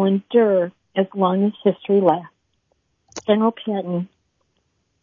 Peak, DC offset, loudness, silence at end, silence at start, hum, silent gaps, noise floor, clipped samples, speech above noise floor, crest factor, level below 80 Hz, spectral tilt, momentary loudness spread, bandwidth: -2 dBFS; under 0.1%; -20 LUFS; 0.95 s; 0 s; none; none; -69 dBFS; under 0.1%; 50 dB; 18 dB; -68 dBFS; -7 dB/octave; 10 LU; 7.2 kHz